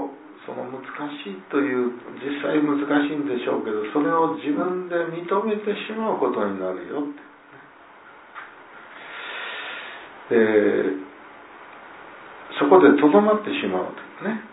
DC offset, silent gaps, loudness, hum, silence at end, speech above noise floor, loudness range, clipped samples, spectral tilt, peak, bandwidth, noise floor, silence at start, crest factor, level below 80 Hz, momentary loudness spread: under 0.1%; none; -22 LUFS; none; 0 s; 26 dB; 10 LU; under 0.1%; -10 dB/octave; -2 dBFS; 4 kHz; -47 dBFS; 0 s; 20 dB; -72 dBFS; 24 LU